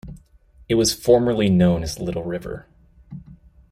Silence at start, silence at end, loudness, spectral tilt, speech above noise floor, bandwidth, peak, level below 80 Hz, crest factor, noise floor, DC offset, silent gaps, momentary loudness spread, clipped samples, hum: 0.05 s; 0.35 s; -20 LUFS; -5.5 dB/octave; 33 dB; 16 kHz; -2 dBFS; -42 dBFS; 18 dB; -52 dBFS; under 0.1%; none; 24 LU; under 0.1%; none